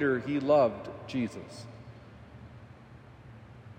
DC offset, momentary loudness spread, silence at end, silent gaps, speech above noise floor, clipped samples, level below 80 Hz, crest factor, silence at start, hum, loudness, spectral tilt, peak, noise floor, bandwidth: under 0.1%; 27 LU; 0.05 s; none; 23 dB; under 0.1%; -62 dBFS; 18 dB; 0 s; none; -29 LUFS; -7 dB/octave; -14 dBFS; -52 dBFS; 9.6 kHz